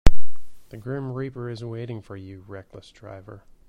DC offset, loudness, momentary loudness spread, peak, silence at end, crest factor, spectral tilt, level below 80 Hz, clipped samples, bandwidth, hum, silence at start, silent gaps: under 0.1%; -34 LUFS; 15 LU; 0 dBFS; 0 s; 18 dB; -6.5 dB/octave; -30 dBFS; 0.3%; 8.2 kHz; none; 0.05 s; none